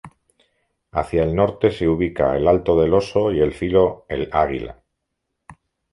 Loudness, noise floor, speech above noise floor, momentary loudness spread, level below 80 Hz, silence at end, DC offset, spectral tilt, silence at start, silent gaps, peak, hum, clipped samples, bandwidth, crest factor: -19 LUFS; -77 dBFS; 59 dB; 9 LU; -38 dBFS; 0.4 s; under 0.1%; -8 dB/octave; 0.05 s; none; -2 dBFS; none; under 0.1%; 11 kHz; 18 dB